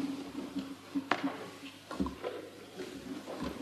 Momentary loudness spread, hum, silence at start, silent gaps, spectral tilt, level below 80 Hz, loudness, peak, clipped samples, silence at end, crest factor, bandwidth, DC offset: 11 LU; 50 Hz at -65 dBFS; 0 s; none; -5 dB/octave; -58 dBFS; -40 LUFS; -10 dBFS; under 0.1%; 0 s; 30 dB; 13.5 kHz; under 0.1%